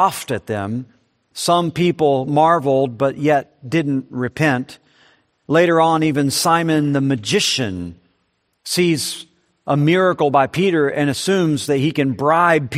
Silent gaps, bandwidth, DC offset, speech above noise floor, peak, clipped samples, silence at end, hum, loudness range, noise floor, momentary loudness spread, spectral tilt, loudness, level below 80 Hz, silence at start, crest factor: none; 15.5 kHz; under 0.1%; 50 dB; 0 dBFS; under 0.1%; 0 s; none; 2 LU; -67 dBFS; 10 LU; -5 dB/octave; -17 LUFS; -58 dBFS; 0 s; 16 dB